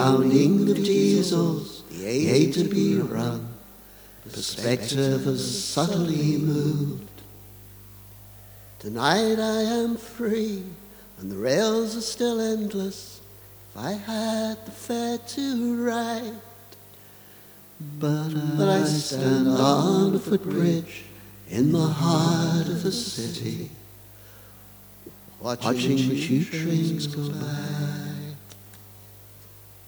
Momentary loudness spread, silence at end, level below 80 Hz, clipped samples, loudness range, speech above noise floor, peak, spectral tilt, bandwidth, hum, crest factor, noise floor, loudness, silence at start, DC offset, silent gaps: 25 LU; 0.1 s; -58 dBFS; under 0.1%; 7 LU; 25 dB; -4 dBFS; -5.5 dB/octave; over 20 kHz; 50 Hz at -50 dBFS; 22 dB; -48 dBFS; -24 LUFS; 0 s; under 0.1%; none